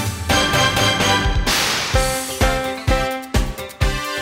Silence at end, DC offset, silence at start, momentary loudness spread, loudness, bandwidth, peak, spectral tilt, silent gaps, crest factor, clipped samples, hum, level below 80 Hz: 0 s; under 0.1%; 0 s; 7 LU; -18 LUFS; 16.5 kHz; -4 dBFS; -3.5 dB/octave; none; 14 dB; under 0.1%; none; -26 dBFS